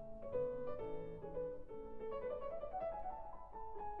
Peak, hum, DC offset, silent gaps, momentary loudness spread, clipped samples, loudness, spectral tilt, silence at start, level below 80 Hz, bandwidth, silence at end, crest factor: -30 dBFS; none; under 0.1%; none; 9 LU; under 0.1%; -46 LUFS; -6.5 dB/octave; 0 s; -58 dBFS; 4.8 kHz; 0 s; 14 dB